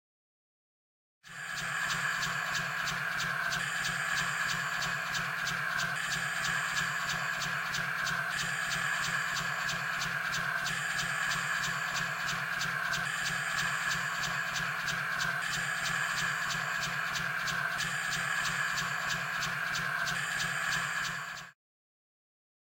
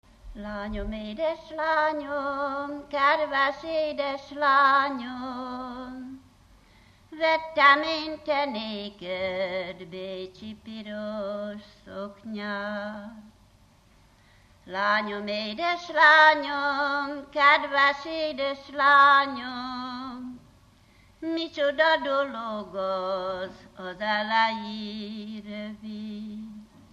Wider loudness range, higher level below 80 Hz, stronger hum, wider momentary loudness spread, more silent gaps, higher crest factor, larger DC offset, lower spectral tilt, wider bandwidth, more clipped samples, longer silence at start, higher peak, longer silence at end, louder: second, 1 LU vs 14 LU; second, -62 dBFS vs -54 dBFS; neither; second, 2 LU vs 19 LU; neither; about the same, 16 dB vs 20 dB; neither; second, -1.5 dB/octave vs -4.5 dB/octave; first, 16.5 kHz vs 9.2 kHz; neither; first, 1.25 s vs 0.25 s; second, -18 dBFS vs -6 dBFS; first, 1.2 s vs 0.3 s; second, -32 LUFS vs -25 LUFS